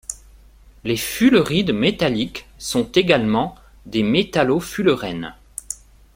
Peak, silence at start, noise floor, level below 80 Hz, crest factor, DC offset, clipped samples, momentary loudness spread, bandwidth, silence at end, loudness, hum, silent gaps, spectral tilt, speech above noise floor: -2 dBFS; 0.1 s; -47 dBFS; -46 dBFS; 18 dB; under 0.1%; under 0.1%; 16 LU; 16.5 kHz; 0.4 s; -19 LUFS; none; none; -5 dB/octave; 29 dB